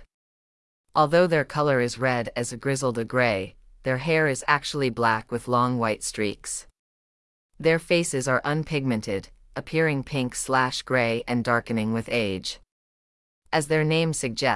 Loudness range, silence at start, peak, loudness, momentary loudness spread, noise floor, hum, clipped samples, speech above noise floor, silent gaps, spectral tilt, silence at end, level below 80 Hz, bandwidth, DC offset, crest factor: 2 LU; 0 s; -6 dBFS; -25 LUFS; 8 LU; under -90 dBFS; none; under 0.1%; over 66 dB; 0.14-0.84 s, 6.79-7.49 s, 12.72-13.42 s; -4.5 dB/octave; 0 s; -54 dBFS; 12 kHz; under 0.1%; 20 dB